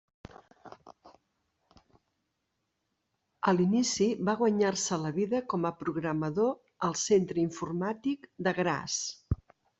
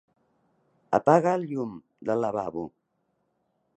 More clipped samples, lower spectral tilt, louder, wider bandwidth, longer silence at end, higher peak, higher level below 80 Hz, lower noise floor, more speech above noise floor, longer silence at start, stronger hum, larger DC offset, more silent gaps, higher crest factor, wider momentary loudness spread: neither; second, -5 dB/octave vs -7.5 dB/octave; second, -30 LUFS vs -26 LUFS; about the same, 8.2 kHz vs 9 kHz; second, 0.45 s vs 1.1 s; second, -12 dBFS vs -4 dBFS; first, -56 dBFS vs -68 dBFS; first, -81 dBFS vs -75 dBFS; about the same, 52 dB vs 50 dB; second, 0.35 s vs 0.9 s; neither; neither; neither; about the same, 20 dB vs 24 dB; second, 8 LU vs 16 LU